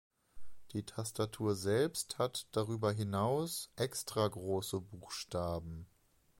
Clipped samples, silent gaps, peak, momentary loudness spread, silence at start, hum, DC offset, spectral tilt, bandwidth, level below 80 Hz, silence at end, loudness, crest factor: under 0.1%; none; -20 dBFS; 10 LU; 0.35 s; none; under 0.1%; -5 dB/octave; 16.5 kHz; -62 dBFS; 0.55 s; -37 LUFS; 18 dB